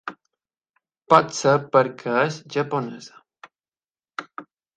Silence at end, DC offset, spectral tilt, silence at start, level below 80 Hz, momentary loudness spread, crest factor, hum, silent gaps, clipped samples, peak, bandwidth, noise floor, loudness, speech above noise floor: 0.35 s; under 0.1%; -5 dB/octave; 0.05 s; -70 dBFS; 20 LU; 24 dB; none; 0.70-0.74 s; under 0.1%; 0 dBFS; 9.4 kHz; under -90 dBFS; -21 LUFS; over 69 dB